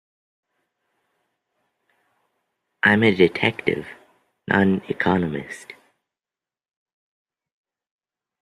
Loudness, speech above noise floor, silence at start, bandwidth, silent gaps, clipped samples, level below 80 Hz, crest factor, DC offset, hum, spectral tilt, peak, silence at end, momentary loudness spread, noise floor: -20 LUFS; over 70 dB; 2.85 s; 11.5 kHz; none; under 0.1%; -60 dBFS; 24 dB; under 0.1%; none; -6.5 dB/octave; -2 dBFS; 2.7 s; 20 LU; under -90 dBFS